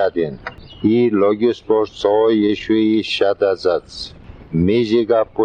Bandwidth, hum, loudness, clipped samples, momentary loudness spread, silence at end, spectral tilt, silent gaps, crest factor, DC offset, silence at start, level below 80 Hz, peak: 9.2 kHz; none; -17 LUFS; under 0.1%; 11 LU; 0 s; -7 dB/octave; none; 12 dB; under 0.1%; 0 s; -46 dBFS; -4 dBFS